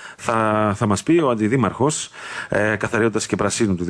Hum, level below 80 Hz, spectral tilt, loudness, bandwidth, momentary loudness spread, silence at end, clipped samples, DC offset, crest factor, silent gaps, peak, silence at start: none; -52 dBFS; -5 dB/octave; -20 LUFS; 11 kHz; 6 LU; 0 s; under 0.1%; under 0.1%; 14 dB; none; -6 dBFS; 0 s